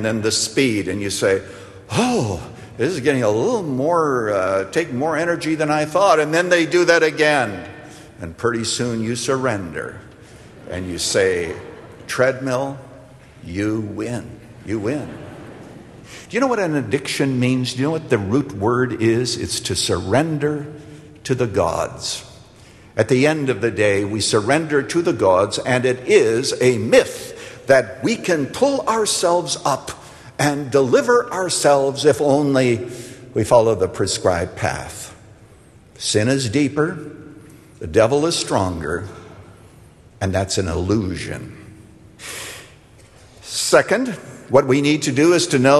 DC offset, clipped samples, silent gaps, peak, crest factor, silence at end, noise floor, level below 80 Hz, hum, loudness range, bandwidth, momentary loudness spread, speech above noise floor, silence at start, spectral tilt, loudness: under 0.1%; under 0.1%; none; 0 dBFS; 18 dB; 0 s; -47 dBFS; -48 dBFS; none; 7 LU; 13 kHz; 18 LU; 29 dB; 0 s; -4.5 dB/octave; -19 LUFS